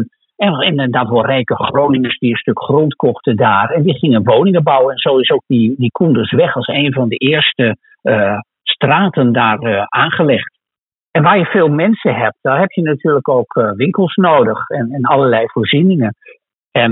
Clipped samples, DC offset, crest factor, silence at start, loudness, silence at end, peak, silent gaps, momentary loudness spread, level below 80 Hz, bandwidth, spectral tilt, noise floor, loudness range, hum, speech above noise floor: under 0.1%; under 0.1%; 12 dB; 0 s; -13 LUFS; 0 s; 0 dBFS; 10.80-10.87 s, 10.97-11.07 s, 16.55-16.59 s, 16.67-16.71 s; 6 LU; -58 dBFS; 4.1 kHz; -4.5 dB/octave; -89 dBFS; 2 LU; none; 76 dB